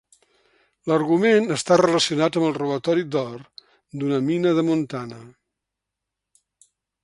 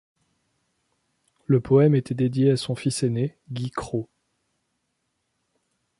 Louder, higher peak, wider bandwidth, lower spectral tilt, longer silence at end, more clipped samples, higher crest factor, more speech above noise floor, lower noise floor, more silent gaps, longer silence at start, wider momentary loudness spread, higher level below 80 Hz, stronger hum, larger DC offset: about the same, -21 LUFS vs -23 LUFS; first, -2 dBFS vs -6 dBFS; about the same, 11.5 kHz vs 11.5 kHz; second, -5 dB/octave vs -7 dB/octave; second, 1.75 s vs 1.95 s; neither; about the same, 20 dB vs 20 dB; first, 63 dB vs 54 dB; first, -84 dBFS vs -76 dBFS; neither; second, 0.85 s vs 1.5 s; about the same, 15 LU vs 14 LU; second, -66 dBFS vs -58 dBFS; neither; neither